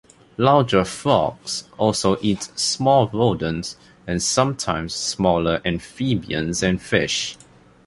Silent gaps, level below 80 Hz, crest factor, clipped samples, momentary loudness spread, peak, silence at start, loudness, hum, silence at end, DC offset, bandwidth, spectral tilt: none; -44 dBFS; 18 dB; under 0.1%; 11 LU; -2 dBFS; 0.4 s; -21 LUFS; none; 0.5 s; under 0.1%; 11.5 kHz; -4.5 dB/octave